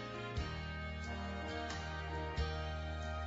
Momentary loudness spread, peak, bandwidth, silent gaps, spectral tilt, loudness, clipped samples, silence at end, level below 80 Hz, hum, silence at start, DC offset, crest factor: 3 LU; -26 dBFS; 7.6 kHz; none; -4.5 dB/octave; -42 LUFS; under 0.1%; 0 s; -46 dBFS; none; 0 s; under 0.1%; 14 dB